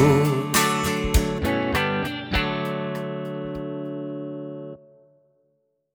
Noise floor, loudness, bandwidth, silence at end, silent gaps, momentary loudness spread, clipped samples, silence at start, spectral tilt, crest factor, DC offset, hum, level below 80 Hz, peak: -70 dBFS; -24 LUFS; over 20 kHz; 1.2 s; none; 14 LU; under 0.1%; 0 s; -5 dB/octave; 20 dB; under 0.1%; none; -34 dBFS; -4 dBFS